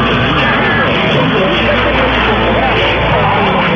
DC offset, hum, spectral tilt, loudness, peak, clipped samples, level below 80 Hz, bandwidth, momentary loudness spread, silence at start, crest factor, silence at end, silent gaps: under 0.1%; none; -6.5 dB/octave; -11 LUFS; -2 dBFS; under 0.1%; -26 dBFS; 7.4 kHz; 1 LU; 0 s; 10 dB; 0 s; none